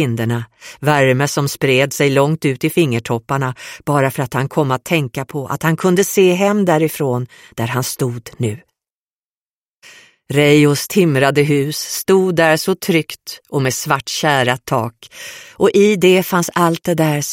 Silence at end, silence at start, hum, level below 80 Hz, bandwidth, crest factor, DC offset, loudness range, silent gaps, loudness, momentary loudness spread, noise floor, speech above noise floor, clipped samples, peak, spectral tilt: 0 s; 0 s; none; -54 dBFS; 16.5 kHz; 16 dB; under 0.1%; 4 LU; 8.90-9.82 s; -16 LUFS; 11 LU; under -90 dBFS; over 75 dB; under 0.1%; 0 dBFS; -5 dB/octave